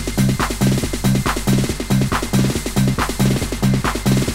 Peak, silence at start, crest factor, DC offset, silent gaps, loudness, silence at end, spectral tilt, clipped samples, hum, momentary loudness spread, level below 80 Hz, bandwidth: -4 dBFS; 0 s; 14 dB; under 0.1%; none; -18 LUFS; 0 s; -5.5 dB/octave; under 0.1%; none; 1 LU; -28 dBFS; 16.5 kHz